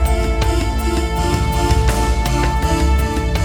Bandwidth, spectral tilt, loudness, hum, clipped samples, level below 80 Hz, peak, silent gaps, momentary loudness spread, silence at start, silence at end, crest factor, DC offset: 19 kHz; -5.5 dB/octave; -17 LUFS; none; under 0.1%; -18 dBFS; -2 dBFS; none; 3 LU; 0 s; 0 s; 14 dB; under 0.1%